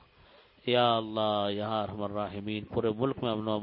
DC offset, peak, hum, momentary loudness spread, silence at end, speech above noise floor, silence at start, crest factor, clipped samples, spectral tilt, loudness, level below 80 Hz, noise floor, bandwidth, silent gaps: under 0.1%; -12 dBFS; none; 9 LU; 0 s; 29 dB; 0.65 s; 20 dB; under 0.1%; -4 dB/octave; -31 LUFS; -60 dBFS; -59 dBFS; 5.2 kHz; none